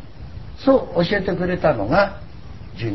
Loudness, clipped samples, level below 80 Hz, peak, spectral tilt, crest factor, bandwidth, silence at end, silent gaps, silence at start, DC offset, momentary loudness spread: -20 LUFS; under 0.1%; -38 dBFS; -4 dBFS; -8.5 dB/octave; 18 dB; 6 kHz; 0 s; none; 0 s; 1%; 21 LU